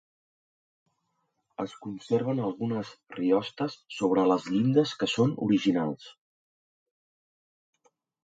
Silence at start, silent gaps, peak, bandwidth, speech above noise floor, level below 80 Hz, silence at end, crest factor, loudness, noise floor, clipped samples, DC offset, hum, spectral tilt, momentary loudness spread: 1.6 s; none; -12 dBFS; 9 kHz; 50 dB; -72 dBFS; 2.1 s; 18 dB; -28 LUFS; -78 dBFS; under 0.1%; under 0.1%; none; -6.5 dB/octave; 13 LU